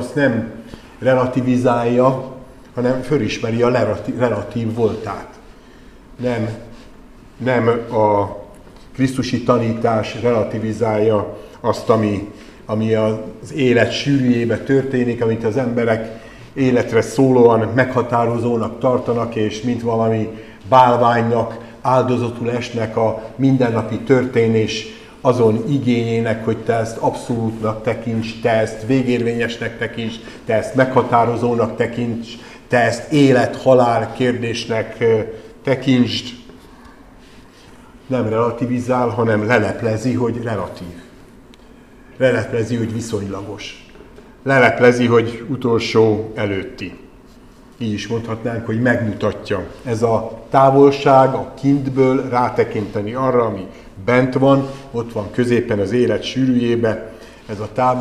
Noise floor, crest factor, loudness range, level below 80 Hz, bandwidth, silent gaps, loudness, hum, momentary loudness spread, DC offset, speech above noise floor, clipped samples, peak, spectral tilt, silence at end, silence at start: -43 dBFS; 18 dB; 5 LU; -46 dBFS; 12.5 kHz; none; -17 LUFS; none; 13 LU; 0.1%; 27 dB; under 0.1%; 0 dBFS; -6.5 dB/octave; 0 s; 0 s